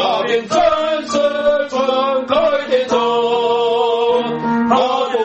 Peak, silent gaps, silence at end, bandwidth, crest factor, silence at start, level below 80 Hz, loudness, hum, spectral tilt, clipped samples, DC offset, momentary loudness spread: 0 dBFS; none; 0 s; 8.4 kHz; 14 dB; 0 s; -50 dBFS; -16 LUFS; none; -4 dB/octave; under 0.1%; under 0.1%; 3 LU